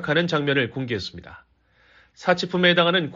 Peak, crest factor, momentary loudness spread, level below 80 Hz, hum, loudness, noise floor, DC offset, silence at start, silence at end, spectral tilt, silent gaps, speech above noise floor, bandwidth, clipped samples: -4 dBFS; 18 dB; 12 LU; -58 dBFS; none; -21 LUFS; -58 dBFS; under 0.1%; 0 s; 0 s; -3 dB/octave; none; 36 dB; 7.6 kHz; under 0.1%